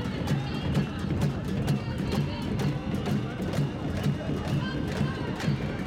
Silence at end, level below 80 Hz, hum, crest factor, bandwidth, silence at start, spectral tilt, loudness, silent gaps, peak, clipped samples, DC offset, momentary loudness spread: 0 s; -42 dBFS; none; 14 dB; 15.5 kHz; 0 s; -7 dB/octave; -30 LUFS; none; -14 dBFS; under 0.1%; under 0.1%; 2 LU